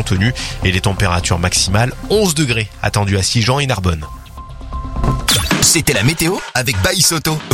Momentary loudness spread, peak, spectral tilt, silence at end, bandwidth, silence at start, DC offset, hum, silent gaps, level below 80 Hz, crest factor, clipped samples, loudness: 13 LU; 0 dBFS; -3.5 dB/octave; 0 s; 16.5 kHz; 0 s; under 0.1%; none; none; -28 dBFS; 16 dB; under 0.1%; -14 LUFS